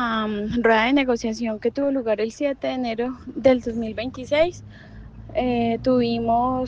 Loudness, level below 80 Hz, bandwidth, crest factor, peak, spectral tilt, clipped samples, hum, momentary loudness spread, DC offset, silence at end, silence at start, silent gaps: -22 LUFS; -46 dBFS; 7.8 kHz; 18 dB; -4 dBFS; -6 dB/octave; under 0.1%; none; 9 LU; under 0.1%; 0 s; 0 s; none